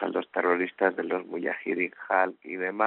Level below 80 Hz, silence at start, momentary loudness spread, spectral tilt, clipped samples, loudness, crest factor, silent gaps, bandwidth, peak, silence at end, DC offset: -80 dBFS; 0 s; 6 LU; -3 dB/octave; under 0.1%; -28 LUFS; 20 dB; none; 4.2 kHz; -8 dBFS; 0 s; under 0.1%